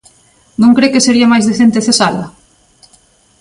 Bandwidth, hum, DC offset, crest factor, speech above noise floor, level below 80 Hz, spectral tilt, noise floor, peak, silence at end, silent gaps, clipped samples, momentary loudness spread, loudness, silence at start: 11.5 kHz; none; under 0.1%; 12 dB; 40 dB; -50 dBFS; -4 dB/octave; -49 dBFS; 0 dBFS; 1.1 s; none; under 0.1%; 14 LU; -10 LUFS; 0.6 s